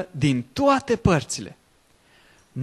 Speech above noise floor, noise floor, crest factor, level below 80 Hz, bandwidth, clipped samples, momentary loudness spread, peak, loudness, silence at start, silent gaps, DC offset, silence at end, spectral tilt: 38 dB; -60 dBFS; 20 dB; -44 dBFS; 13 kHz; under 0.1%; 15 LU; -4 dBFS; -22 LUFS; 0 s; none; under 0.1%; 0 s; -5.5 dB/octave